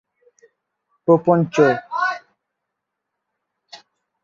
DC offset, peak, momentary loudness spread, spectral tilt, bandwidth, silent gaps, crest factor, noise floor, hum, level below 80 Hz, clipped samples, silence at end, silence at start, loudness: under 0.1%; -2 dBFS; 10 LU; -7 dB/octave; 7.4 kHz; none; 20 dB; -80 dBFS; none; -66 dBFS; under 0.1%; 0.5 s; 1.05 s; -18 LUFS